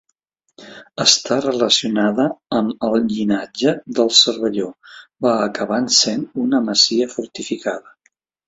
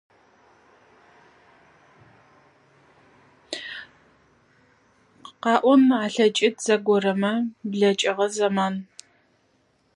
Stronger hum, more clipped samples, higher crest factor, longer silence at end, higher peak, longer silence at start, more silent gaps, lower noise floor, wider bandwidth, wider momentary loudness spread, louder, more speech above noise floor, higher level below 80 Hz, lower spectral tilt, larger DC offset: neither; neither; about the same, 18 dB vs 22 dB; second, 0.65 s vs 1.15 s; first, 0 dBFS vs -4 dBFS; second, 0.6 s vs 3.5 s; neither; first, -69 dBFS vs -65 dBFS; second, 8 kHz vs 11.5 kHz; second, 11 LU vs 17 LU; first, -17 LUFS vs -22 LUFS; first, 51 dB vs 44 dB; first, -60 dBFS vs -74 dBFS; second, -2.5 dB/octave vs -4.5 dB/octave; neither